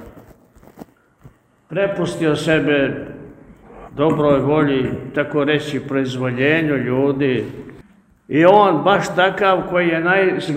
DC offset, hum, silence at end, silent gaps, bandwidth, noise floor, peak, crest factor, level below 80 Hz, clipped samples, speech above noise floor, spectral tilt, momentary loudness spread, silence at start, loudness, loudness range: under 0.1%; none; 0 s; none; 14.5 kHz; -48 dBFS; 0 dBFS; 18 dB; -50 dBFS; under 0.1%; 32 dB; -6.5 dB/octave; 9 LU; 0 s; -17 LUFS; 5 LU